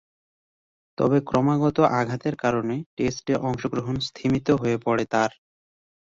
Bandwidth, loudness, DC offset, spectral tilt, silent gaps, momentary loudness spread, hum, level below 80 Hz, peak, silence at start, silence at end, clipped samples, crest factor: 7.8 kHz; -24 LUFS; under 0.1%; -6.5 dB/octave; 2.86-2.97 s; 7 LU; none; -54 dBFS; -4 dBFS; 1 s; 0.8 s; under 0.1%; 20 dB